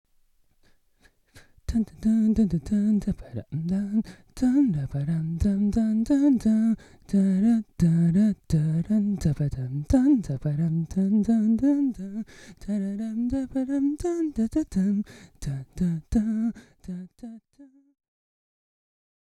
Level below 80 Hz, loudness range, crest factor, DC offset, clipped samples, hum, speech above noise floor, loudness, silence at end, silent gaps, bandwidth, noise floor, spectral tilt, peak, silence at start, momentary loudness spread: -44 dBFS; 7 LU; 16 dB; under 0.1%; under 0.1%; none; 39 dB; -25 LUFS; 1.75 s; none; 11.5 kHz; -63 dBFS; -8.5 dB/octave; -10 dBFS; 1.35 s; 14 LU